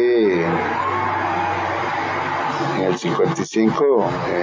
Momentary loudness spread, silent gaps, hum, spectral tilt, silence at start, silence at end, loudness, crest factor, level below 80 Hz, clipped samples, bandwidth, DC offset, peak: 5 LU; none; none; -6 dB/octave; 0 s; 0 s; -20 LUFS; 14 dB; -50 dBFS; under 0.1%; 7.6 kHz; under 0.1%; -4 dBFS